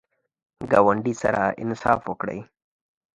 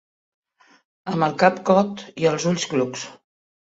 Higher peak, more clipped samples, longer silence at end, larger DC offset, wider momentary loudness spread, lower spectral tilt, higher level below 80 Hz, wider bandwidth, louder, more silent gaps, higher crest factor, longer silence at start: about the same, -2 dBFS vs -2 dBFS; neither; first, 0.7 s vs 0.5 s; neither; about the same, 13 LU vs 14 LU; first, -6.5 dB/octave vs -5 dB/octave; first, -56 dBFS vs -64 dBFS; first, 10.5 kHz vs 8 kHz; about the same, -23 LUFS vs -21 LUFS; neither; about the same, 22 dB vs 20 dB; second, 0.6 s vs 1.05 s